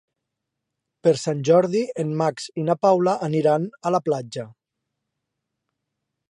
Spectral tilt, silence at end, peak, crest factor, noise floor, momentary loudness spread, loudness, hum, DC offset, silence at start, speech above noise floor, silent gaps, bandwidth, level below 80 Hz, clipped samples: -6.5 dB/octave; 1.8 s; -6 dBFS; 18 dB; -82 dBFS; 9 LU; -22 LUFS; none; under 0.1%; 1.05 s; 61 dB; none; 11 kHz; -72 dBFS; under 0.1%